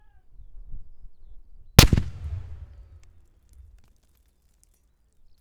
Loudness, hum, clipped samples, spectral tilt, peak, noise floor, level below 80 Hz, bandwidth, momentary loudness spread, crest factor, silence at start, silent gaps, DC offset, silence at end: -20 LUFS; none; under 0.1%; -4 dB/octave; 0 dBFS; -64 dBFS; -32 dBFS; over 20 kHz; 26 LU; 28 dB; 0.5 s; none; under 0.1%; 2.75 s